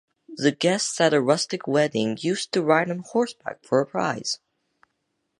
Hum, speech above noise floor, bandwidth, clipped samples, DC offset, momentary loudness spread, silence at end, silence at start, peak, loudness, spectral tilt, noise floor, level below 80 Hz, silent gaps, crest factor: none; 53 dB; 11.5 kHz; under 0.1%; under 0.1%; 8 LU; 1.05 s; 0.3 s; -4 dBFS; -23 LUFS; -4 dB/octave; -76 dBFS; -72 dBFS; none; 22 dB